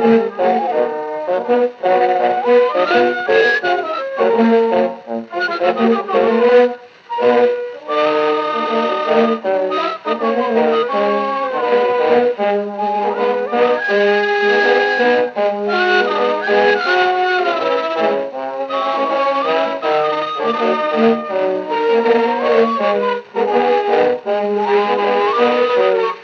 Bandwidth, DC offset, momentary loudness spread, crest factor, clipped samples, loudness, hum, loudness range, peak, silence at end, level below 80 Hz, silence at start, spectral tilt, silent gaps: 6.6 kHz; under 0.1%; 6 LU; 14 dB; under 0.1%; -15 LUFS; none; 2 LU; -2 dBFS; 0 s; -74 dBFS; 0 s; -5.5 dB/octave; none